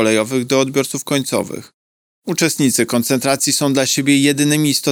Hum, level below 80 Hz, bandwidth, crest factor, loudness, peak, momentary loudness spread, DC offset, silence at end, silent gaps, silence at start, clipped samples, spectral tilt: none; -62 dBFS; over 20 kHz; 16 dB; -16 LUFS; 0 dBFS; 8 LU; under 0.1%; 0 s; 1.74-2.22 s; 0 s; under 0.1%; -3.5 dB/octave